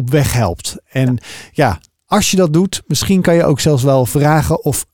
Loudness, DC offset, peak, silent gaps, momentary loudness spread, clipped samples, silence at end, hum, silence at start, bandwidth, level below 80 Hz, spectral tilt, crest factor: -14 LUFS; 0.5%; 0 dBFS; none; 8 LU; under 0.1%; 0.1 s; none; 0 s; 18 kHz; -36 dBFS; -5.5 dB/octave; 14 dB